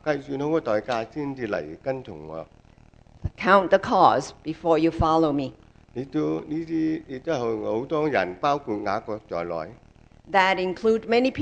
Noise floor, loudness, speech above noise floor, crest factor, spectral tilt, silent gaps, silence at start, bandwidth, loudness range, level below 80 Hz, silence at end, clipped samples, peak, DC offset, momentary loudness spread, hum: -53 dBFS; -24 LUFS; 29 dB; 22 dB; -6 dB/octave; none; 0.05 s; 9 kHz; 5 LU; -48 dBFS; 0 s; under 0.1%; -4 dBFS; under 0.1%; 15 LU; none